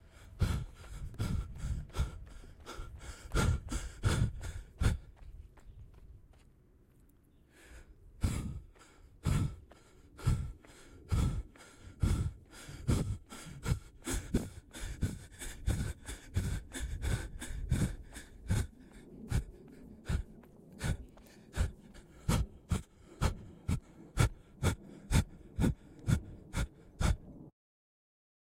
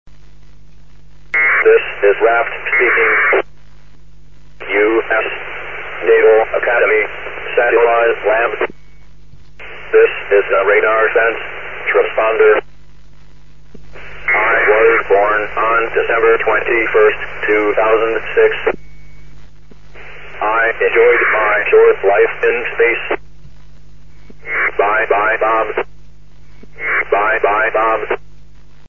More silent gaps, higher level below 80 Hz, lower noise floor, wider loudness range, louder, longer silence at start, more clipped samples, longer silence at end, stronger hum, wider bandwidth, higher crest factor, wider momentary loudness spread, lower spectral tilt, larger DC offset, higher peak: neither; about the same, -42 dBFS vs -44 dBFS; first, -64 dBFS vs -45 dBFS; about the same, 6 LU vs 4 LU; second, -38 LUFS vs -13 LUFS; about the same, 0.05 s vs 0.05 s; neither; first, 1 s vs 0.7 s; neither; first, 16 kHz vs 3.4 kHz; first, 22 dB vs 14 dB; first, 21 LU vs 12 LU; about the same, -5.5 dB/octave vs -6 dB/octave; second, under 0.1% vs 3%; second, -14 dBFS vs 0 dBFS